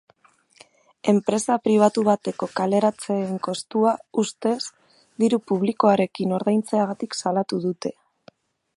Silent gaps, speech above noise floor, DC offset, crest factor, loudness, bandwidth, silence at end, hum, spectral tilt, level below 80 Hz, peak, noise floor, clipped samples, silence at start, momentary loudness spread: none; 37 dB; under 0.1%; 20 dB; -23 LUFS; 11.5 kHz; 0.85 s; none; -5.5 dB/octave; -70 dBFS; -4 dBFS; -59 dBFS; under 0.1%; 1.05 s; 9 LU